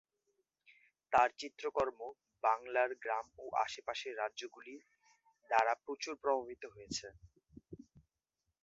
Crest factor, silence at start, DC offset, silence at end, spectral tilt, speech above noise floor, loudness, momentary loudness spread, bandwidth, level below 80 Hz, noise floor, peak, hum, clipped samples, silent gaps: 24 dB; 1.1 s; under 0.1%; 0.65 s; -1 dB/octave; 51 dB; -37 LUFS; 21 LU; 7.6 kHz; -72 dBFS; -88 dBFS; -16 dBFS; none; under 0.1%; none